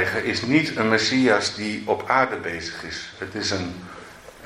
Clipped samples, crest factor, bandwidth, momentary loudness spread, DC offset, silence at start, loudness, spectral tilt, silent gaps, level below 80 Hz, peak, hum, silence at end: under 0.1%; 20 dB; 14.5 kHz; 14 LU; under 0.1%; 0 s; -22 LUFS; -4 dB/octave; none; -56 dBFS; -2 dBFS; none; 0 s